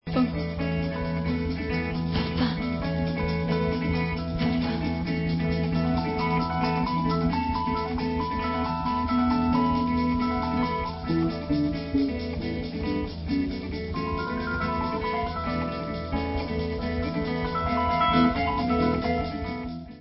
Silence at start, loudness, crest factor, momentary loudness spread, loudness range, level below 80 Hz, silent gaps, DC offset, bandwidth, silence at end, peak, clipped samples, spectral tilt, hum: 0.05 s; -27 LUFS; 16 dB; 6 LU; 3 LU; -38 dBFS; none; under 0.1%; 5.8 kHz; 0 s; -10 dBFS; under 0.1%; -11 dB/octave; none